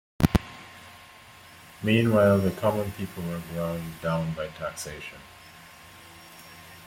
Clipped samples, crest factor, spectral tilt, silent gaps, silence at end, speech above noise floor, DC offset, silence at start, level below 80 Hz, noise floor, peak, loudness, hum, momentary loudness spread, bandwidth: under 0.1%; 24 dB; -6.5 dB/octave; none; 0 s; 23 dB; under 0.1%; 0.2 s; -46 dBFS; -50 dBFS; -4 dBFS; -27 LUFS; none; 25 LU; 16.5 kHz